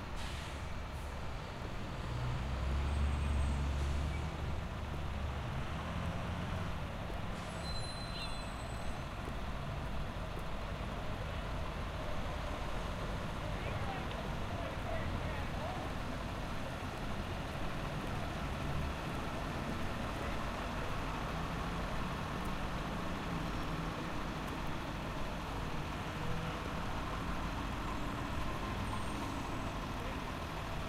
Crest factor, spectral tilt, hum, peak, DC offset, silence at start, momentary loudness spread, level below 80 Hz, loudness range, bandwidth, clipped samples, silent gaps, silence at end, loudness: 14 dB; -5.5 dB/octave; none; -24 dBFS; under 0.1%; 0 s; 4 LU; -44 dBFS; 4 LU; 15.5 kHz; under 0.1%; none; 0 s; -40 LUFS